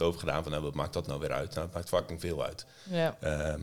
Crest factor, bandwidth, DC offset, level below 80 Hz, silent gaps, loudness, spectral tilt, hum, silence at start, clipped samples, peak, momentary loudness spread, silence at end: 18 dB; 19 kHz; 0.2%; -50 dBFS; none; -34 LUFS; -5.5 dB/octave; none; 0 s; under 0.1%; -14 dBFS; 5 LU; 0 s